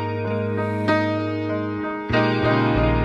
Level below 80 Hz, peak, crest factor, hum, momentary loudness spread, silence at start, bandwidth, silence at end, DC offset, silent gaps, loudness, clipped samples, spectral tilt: -36 dBFS; -8 dBFS; 14 dB; none; 6 LU; 0 s; 8 kHz; 0 s; under 0.1%; none; -22 LUFS; under 0.1%; -8 dB/octave